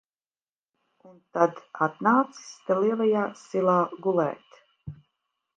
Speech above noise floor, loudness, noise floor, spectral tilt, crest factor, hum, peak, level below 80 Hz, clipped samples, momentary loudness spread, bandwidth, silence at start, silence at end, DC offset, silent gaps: over 65 dB; -25 LUFS; under -90 dBFS; -7 dB/octave; 22 dB; none; -6 dBFS; -70 dBFS; under 0.1%; 21 LU; 9 kHz; 1.35 s; 0.65 s; under 0.1%; none